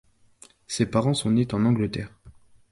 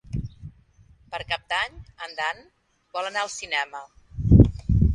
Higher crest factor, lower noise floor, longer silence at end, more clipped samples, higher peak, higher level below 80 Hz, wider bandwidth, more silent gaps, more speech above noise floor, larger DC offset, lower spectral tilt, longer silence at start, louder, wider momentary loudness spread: second, 18 dB vs 24 dB; about the same, -54 dBFS vs -55 dBFS; first, 0.4 s vs 0 s; neither; second, -8 dBFS vs 0 dBFS; second, -52 dBFS vs -30 dBFS; first, 11.5 kHz vs 9.6 kHz; neither; first, 31 dB vs 25 dB; neither; about the same, -6 dB/octave vs -6 dB/octave; first, 0.7 s vs 0.1 s; about the same, -24 LUFS vs -24 LUFS; second, 12 LU vs 22 LU